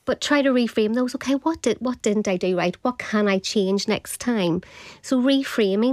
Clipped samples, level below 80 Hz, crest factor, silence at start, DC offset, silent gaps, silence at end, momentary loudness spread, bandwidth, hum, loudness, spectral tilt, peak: under 0.1%; -58 dBFS; 14 dB; 0.05 s; under 0.1%; none; 0 s; 5 LU; 15 kHz; none; -22 LUFS; -4.5 dB/octave; -8 dBFS